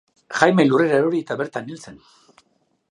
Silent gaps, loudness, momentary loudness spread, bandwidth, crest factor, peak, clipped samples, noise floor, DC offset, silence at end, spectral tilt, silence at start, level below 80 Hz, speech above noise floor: none; -19 LUFS; 17 LU; 11 kHz; 22 dB; 0 dBFS; under 0.1%; -66 dBFS; under 0.1%; 0.95 s; -6 dB/octave; 0.3 s; -66 dBFS; 47 dB